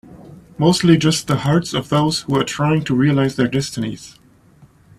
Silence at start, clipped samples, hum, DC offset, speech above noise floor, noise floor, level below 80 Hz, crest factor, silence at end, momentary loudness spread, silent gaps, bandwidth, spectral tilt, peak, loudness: 0.1 s; under 0.1%; none; under 0.1%; 32 dB; -49 dBFS; -48 dBFS; 18 dB; 0.9 s; 9 LU; none; 14 kHz; -5.5 dB/octave; 0 dBFS; -17 LUFS